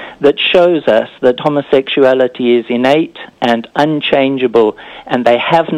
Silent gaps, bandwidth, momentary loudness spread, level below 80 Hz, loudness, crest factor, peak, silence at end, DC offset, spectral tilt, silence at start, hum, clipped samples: none; 10.5 kHz; 5 LU; -54 dBFS; -12 LUFS; 12 dB; 0 dBFS; 0 s; under 0.1%; -6.5 dB/octave; 0 s; none; under 0.1%